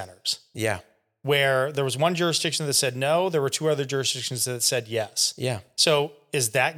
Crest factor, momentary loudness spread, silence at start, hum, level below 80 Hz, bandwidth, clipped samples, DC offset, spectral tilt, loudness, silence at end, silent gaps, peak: 18 dB; 8 LU; 0 s; none; -70 dBFS; 18 kHz; under 0.1%; under 0.1%; -3 dB/octave; -24 LUFS; 0 s; none; -6 dBFS